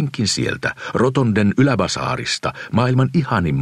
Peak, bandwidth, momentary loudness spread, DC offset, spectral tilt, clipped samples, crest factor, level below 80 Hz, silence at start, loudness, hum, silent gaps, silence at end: -2 dBFS; 11.5 kHz; 6 LU; under 0.1%; -5.5 dB/octave; under 0.1%; 16 dB; -46 dBFS; 0 s; -18 LUFS; none; none; 0 s